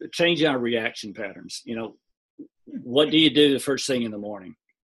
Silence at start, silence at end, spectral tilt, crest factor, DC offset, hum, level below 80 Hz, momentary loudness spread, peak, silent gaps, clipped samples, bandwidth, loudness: 0 s; 0.4 s; -4 dB/octave; 20 dB; under 0.1%; none; -66 dBFS; 19 LU; -6 dBFS; 2.17-2.38 s; under 0.1%; 12.5 kHz; -22 LUFS